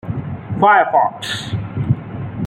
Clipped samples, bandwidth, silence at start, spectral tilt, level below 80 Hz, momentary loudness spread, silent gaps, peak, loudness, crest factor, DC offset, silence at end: under 0.1%; 15.5 kHz; 0.05 s; -6 dB/octave; -44 dBFS; 14 LU; none; -2 dBFS; -17 LUFS; 16 dB; under 0.1%; 0 s